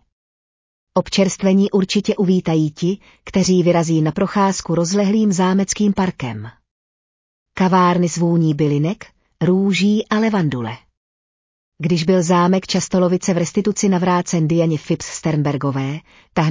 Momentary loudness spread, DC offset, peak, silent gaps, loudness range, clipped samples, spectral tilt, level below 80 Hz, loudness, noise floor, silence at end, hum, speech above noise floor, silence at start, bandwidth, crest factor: 9 LU; under 0.1%; -4 dBFS; 6.71-7.46 s, 10.97-11.72 s; 2 LU; under 0.1%; -6 dB/octave; -50 dBFS; -17 LUFS; under -90 dBFS; 0 s; none; over 73 dB; 0.95 s; 7.8 kHz; 14 dB